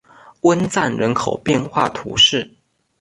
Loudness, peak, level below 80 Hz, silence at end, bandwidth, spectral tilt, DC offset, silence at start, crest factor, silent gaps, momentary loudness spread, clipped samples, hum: -17 LUFS; -2 dBFS; -50 dBFS; 0.55 s; 11.5 kHz; -4 dB/octave; under 0.1%; 0.45 s; 18 dB; none; 8 LU; under 0.1%; none